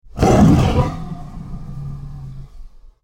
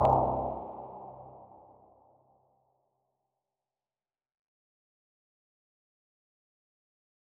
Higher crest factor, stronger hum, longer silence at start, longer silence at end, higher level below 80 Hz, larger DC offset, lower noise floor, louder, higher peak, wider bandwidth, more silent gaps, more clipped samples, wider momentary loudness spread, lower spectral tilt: second, 16 dB vs 26 dB; neither; about the same, 0.05 s vs 0 s; second, 0.35 s vs 5.95 s; first, -28 dBFS vs -56 dBFS; neither; second, -37 dBFS vs under -90 dBFS; first, -14 LUFS vs -32 LUFS; first, -2 dBFS vs -10 dBFS; first, 16 kHz vs 4.9 kHz; neither; neither; second, 22 LU vs 26 LU; about the same, -7.5 dB/octave vs -8.5 dB/octave